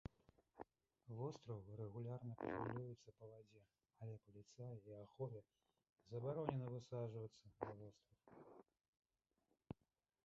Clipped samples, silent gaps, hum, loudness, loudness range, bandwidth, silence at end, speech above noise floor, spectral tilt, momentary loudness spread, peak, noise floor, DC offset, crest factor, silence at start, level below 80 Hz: under 0.1%; 5.92-5.96 s, 8.88-8.93 s; none; -53 LUFS; 6 LU; 7.4 kHz; 0.5 s; 38 dB; -8 dB/octave; 17 LU; -26 dBFS; -90 dBFS; under 0.1%; 28 dB; 0.55 s; -76 dBFS